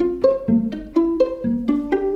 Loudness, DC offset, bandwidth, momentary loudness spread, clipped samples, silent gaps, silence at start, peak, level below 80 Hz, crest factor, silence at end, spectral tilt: -20 LUFS; under 0.1%; 6.8 kHz; 4 LU; under 0.1%; none; 0 s; -6 dBFS; -44 dBFS; 14 dB; 0 s; -9 dB/octave